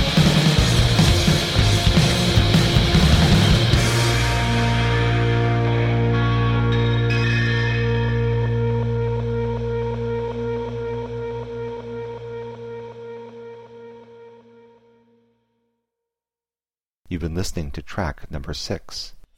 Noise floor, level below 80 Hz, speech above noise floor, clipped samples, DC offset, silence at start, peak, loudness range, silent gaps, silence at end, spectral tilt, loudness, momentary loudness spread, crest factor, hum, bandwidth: under -90 dBFS; -30 dBFS; over 63 dB; under 0.1%; under 0.1%; 0 s; -4 dBFS; 18 LU; 16.97-17.03 s; 0.15 s; -5.5 dB/octave; -19 LUFS; 17 LU; 16 dB; none; 15.5 kHz